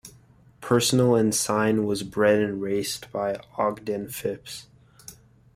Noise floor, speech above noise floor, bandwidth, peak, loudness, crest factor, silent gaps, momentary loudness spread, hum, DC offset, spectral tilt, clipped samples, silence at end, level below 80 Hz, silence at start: -54 dBFS; 31 dB; 16 kHz; -8 dBFS; -24 LUFS; 18 dB; none; 18 LU; none; under 0.1%; -4.5 dB/octave; under 0.1%; 0.45 s; -60 dBFS; 0.05 s